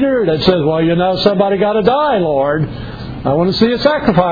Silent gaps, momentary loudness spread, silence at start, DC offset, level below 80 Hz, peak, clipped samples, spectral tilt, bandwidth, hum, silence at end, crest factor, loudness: none; 7 LU; 0 s; under 0.1%; -36 dBFS; 0 dBFS; under 0.1%; -8 dB/octave; 5 kHz; none; 0 s; 12 dB; -13 LUFS